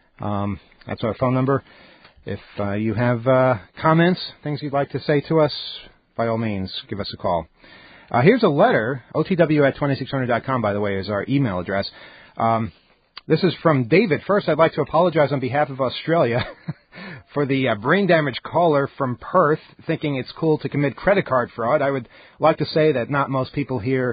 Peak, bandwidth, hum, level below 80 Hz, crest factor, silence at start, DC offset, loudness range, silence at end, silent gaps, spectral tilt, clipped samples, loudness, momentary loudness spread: -2 dBFS; 5 kHz; none; -50 dBFS; 18 dB; 0.2 s; under 0.1%; 4 LU; 0 s; none; -11.5 dB/octave; under 0.1%; -21 LUFS; 12 LU